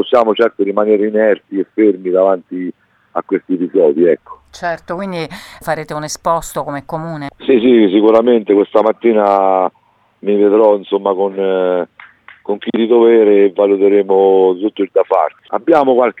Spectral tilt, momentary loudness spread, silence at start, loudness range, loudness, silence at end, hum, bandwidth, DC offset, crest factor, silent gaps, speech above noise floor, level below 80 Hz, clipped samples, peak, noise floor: -6 dB/octave; 13 LU; 0 s; 6 LU; -13 LUFS; 0.1 s; none; 13.5 kHz; under 0.1%; 12 dB; none; 28 dB; -52 dBFS; under 0.1%; 0 dBFS; -40 dBFS